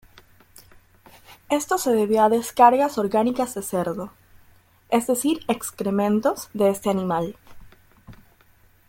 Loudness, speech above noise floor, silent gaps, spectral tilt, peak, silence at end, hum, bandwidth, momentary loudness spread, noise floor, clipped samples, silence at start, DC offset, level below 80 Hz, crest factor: -22 LUFS; 35 dB; none; -5 dB/octave; -2 dBFS; 0.75 s; none; 17 kHz; 10 LU; -56 dBFS; under 0.1%; 1.3 s; under 0.1%; -58 dBFS; 22 dB